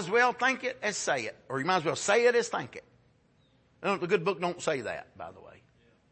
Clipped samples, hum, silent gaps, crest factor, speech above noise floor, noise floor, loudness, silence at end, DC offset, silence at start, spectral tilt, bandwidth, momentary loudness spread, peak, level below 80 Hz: under 0.1%; none; none; 20 dB; 37 dB; -66 dBFS; -29 LUFS; 0.6 s; under 0.1%; 0 s; -3.5 dB/octave; 8.8 kHz; 17 LU; -12 dBFS; -72 dBFS